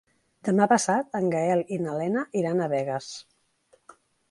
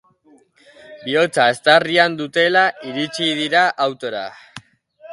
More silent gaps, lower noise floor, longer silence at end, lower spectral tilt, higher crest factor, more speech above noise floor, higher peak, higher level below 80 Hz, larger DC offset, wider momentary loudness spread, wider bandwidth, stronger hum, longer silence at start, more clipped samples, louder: neither; first, -64 dBFS vs -54 dBFS; first, 1.1 s vs 0 s; first, -5.5 dB/octave vs -3.5 dB/octave; about the same, 20 dB vs 18 dB; about the same, 39 dB vs 36 dB; second, -6 dBFS vs 0 dBFS; second, -72 dBFS vs -66 dBFS; neither; about the same, 13 LU vs 13 LU; about the same, 11.5 kHz vs 11.5 kHz; neither; second, 0.45 s vs 0.9 s; neither; second, -26 LUFS vs -17 LUFS